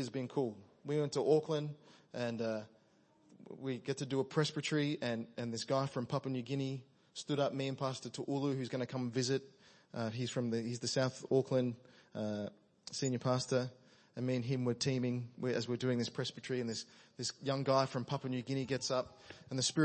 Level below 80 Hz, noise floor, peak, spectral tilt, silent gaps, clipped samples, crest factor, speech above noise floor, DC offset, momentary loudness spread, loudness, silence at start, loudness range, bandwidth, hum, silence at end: -78 dBFS; -69 dBFS; -16 dBFS; -5 dB/octave; none; under 0.1%; 20 dB; 33 dB; under 0.1%; 12 LU; -37 LUFS; 0 s; 2 LU; 8.4 kHz; none; 0 s